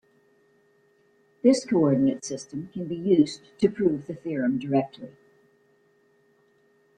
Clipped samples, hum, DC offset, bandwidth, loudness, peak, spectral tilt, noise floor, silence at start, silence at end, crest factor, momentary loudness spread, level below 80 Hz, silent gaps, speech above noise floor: under 0.1%; none; under 0.1%; 10.5 kHz; -25 LUFS; -6 dBFS; -6.5 dB/octave; -64 dBFS; 1.45 s; 1.9 s; 20 dB; 13 LU; -66 dBFS; none; 40 dB